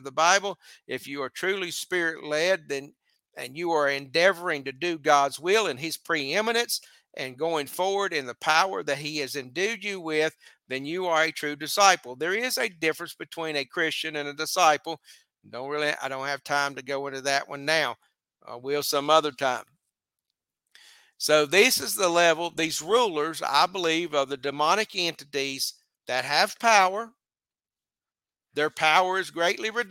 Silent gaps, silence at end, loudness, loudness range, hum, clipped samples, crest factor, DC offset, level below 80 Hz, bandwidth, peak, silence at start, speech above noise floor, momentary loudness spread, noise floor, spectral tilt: none; 0 s; -25 LUFS; 5 LU; none; under 0.1%; 24 dB; under 0.1%; -78 dBFS; 17 kHz; -2 dBFS; 0.05 s; over 64 dB; 13 LU; under -90 dBFS; -2 dB/octave